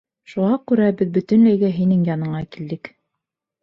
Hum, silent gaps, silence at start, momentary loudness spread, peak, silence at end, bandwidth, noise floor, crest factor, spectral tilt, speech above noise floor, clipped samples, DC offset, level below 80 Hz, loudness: none; none; 0.3 s; 15 LU; -6 dBFS; 0.75 s; 5.8 kHz; -82 dBFS; 14 dB; -10 dB/octave; 64 dB; under 0.1%; under 0.1%; -58 dBFS; -18 LUFS